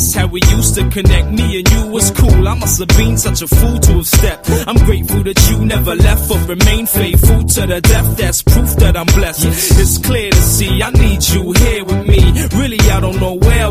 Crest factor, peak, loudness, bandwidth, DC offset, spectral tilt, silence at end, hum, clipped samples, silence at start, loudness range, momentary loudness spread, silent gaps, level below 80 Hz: 10 dB; 0 dBFS; -11 LUFS; 16 kHz; under 0.1%; -4.5 dB/octave; 0 s; none; 0.4%; 0 s; 1 LU; 4 LU; none; -14 dBFS